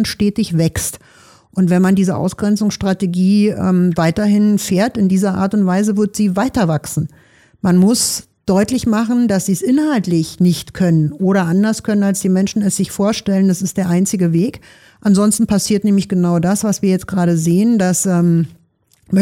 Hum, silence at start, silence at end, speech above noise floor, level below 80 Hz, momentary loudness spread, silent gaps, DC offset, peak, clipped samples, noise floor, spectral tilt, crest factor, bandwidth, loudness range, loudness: none; 0 s; 0 s; 42 dB; -44 dBFS; 5 LU; none; under 0.1%; -4 dBFS; under 0.1%; -56 dBFS; -6 dB/octave; 12 dB; 16 kHz; 2 LU; -15 LUFS